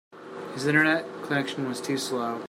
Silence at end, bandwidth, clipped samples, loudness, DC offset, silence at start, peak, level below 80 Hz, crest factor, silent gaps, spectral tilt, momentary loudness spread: 0.05 s; 16 kHz; under 0.1%; -26 LUFS; under 0.1%; 0.1 s; -8 dBFS; -72 dBFS; 20 dB; none; -4.5 dB/octave; 16 LU